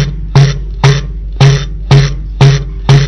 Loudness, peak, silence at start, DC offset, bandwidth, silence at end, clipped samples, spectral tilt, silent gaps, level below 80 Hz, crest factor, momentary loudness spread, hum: -10 LUFS; 0 dBFS; 0 s; under 0.1%; 7.2 kHz; 0 s; 6%; -6 dB/octave; none; -18 dBFS; 8 dB; 6 LU; none